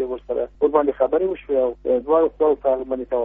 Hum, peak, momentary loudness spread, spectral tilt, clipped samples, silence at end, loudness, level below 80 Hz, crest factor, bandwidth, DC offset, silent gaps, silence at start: 50 Hz at -50 dBFS; -4 dBFS; 6 LU; -5.5 dB/octave; under 0.1%; 0 s; -21 LUFS; -48 dBFS; 16 dB; 3.8 kHz; under 0.1%; none; 0 s